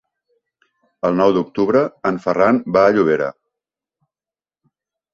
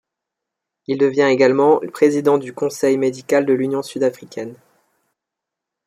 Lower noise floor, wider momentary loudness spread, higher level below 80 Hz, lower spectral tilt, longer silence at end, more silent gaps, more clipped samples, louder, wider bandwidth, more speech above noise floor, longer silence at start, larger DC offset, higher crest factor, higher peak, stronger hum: first, under -90 dBFS vs -83 dBFS; second, 7 LU vs 17 LU; first, -58 dBFS vs -68 dBFS; first, -7.5 dB/octave vs -5.5 dB/octave; first, 1.8 s vs 1.3 s; neither; neither; about the same, -17 LUFS vs -17 LUFS; second, 7.4 kHz vs 15 kHz; first, over 74 dB vs 66 dB; first, 1.05 s vs 0.9 s; neither; about the same, 18 dB vs 16 dB; about the same, -2 dBFS vs -2 dBFS; neither